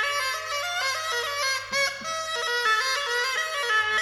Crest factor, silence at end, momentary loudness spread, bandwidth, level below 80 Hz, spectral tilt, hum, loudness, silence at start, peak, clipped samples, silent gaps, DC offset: 14 dB; 0 s; 5 LU; 17.5 kHz; -64 dBFS; 1 dB/octave; none; -25 LUFS; 0 s; -12 dBFS; under 0.1%; none; under 0.1%